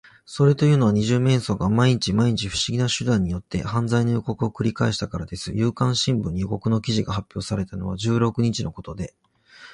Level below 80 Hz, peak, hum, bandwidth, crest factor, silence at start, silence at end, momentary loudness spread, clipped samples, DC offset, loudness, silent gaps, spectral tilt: -44 dBFS; -6 dBFS; none; 11 kHz; 16 dB; 0.3 s; 0 s; 10 LU; under 0.1%; under 0.1%; -22 LUFS; none; -6 dB/octave